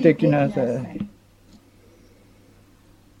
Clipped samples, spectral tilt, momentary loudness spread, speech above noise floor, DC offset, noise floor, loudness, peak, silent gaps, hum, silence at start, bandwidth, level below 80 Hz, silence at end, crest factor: under 0.1%; -9 dB/octave; 16 LU; 34 dB; under 0.1%; -53 dBFS; -22 LUFS; -2 dBFS; none; none; 0 s; 11.5 kHz; -56 dBFS; 2.1 s; 22 dB